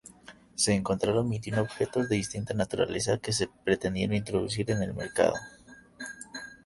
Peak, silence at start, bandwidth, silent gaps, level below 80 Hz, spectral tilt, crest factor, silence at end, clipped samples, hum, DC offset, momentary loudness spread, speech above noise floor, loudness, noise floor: -10 dBFS; 0.3 s; 11.5 kHz; none; -54 dBFS; -4.5 dB/octave; 20 dB; 0.1 s; under 0.1%; none; under 0.1%; 14 LU; 24 dB; -29 LUFS; -53 dBFS